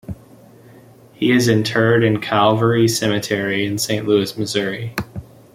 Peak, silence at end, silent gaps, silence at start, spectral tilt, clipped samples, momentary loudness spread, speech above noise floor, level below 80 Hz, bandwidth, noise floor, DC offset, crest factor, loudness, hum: -2 dBFS; 0.3 s; none; 0.1 s; -5 dB/octave; under 0.1%; 13 LU; 28 dB; -52 dBFS; 16 kHz; -45 dBFS; under 0.1%; 16 dB; -17 LUFS; none